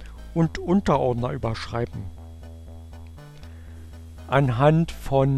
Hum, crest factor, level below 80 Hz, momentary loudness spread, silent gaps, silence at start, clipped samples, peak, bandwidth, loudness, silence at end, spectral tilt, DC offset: none; 20 dB; -42 dBFS; 23 LU; none; 0 s; under 0.1%; -4 dBFS; 13 kHz; -23 LUFS; 0 s; -8 dB/octave; under 0.1%